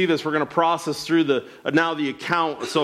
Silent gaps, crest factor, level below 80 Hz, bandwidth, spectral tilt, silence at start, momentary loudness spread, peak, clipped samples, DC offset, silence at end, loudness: none; 16 dB; -64 dBFS; 14 kHz; -5 dB/octave; 0 s; 4 LU; -6 dBFS; under 0.1%; under 0.1%; 0 s; -22 LUFS